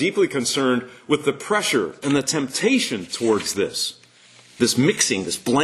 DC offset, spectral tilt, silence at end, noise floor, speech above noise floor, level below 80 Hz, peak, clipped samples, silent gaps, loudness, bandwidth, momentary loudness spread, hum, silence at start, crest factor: under 0.1%; -3.5 dB/octave; 0 s; -50 dBFS; 29 dB; -62 dBFS; -4 dBFS; under 0.1%; none; -21 LUFS; 13 kHz; 6 LU; none; 0 s; 18 dB